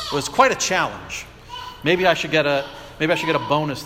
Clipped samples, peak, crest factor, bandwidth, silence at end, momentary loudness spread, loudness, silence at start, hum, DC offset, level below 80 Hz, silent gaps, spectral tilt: under 0.1%; -2 dBFS; 20 dB; 16.5 kHz; 0 s; 16 LU; -20 LUFS; 0 s; none; under 0.1%; -48 dBFS; none; -3.5 dB/octave